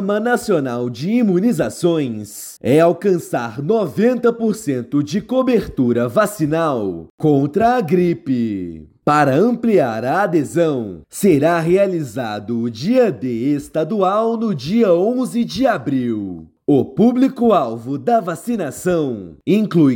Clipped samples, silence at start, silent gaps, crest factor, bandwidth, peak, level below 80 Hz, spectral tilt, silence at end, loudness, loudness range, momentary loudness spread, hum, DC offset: under 0.1%; 0 s; 7.10-7.18 s; 14 dB; 17 kHz; -4 dBFS; -52 dBFS; -7 dB/octave; 0 s; -17 LUFS; 1 LU; 9 LU; none; under 0.1%